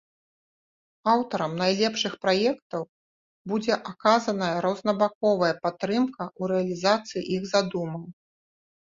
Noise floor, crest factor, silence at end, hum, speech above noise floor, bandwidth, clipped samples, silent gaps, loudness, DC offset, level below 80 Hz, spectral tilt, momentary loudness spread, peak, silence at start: under -90 dBFS; 20 dB; 0.8 s; none; over 65 dB; 7.6 kHz; under 0.1%; 2.62-2.70 s, 2.89-3.45 s, 5.15-5.21 s; -26 LUFS; under 0.1%; -68 dBFS; -5 dB/octave; 10 LU; -6 dBFS; 1.05 s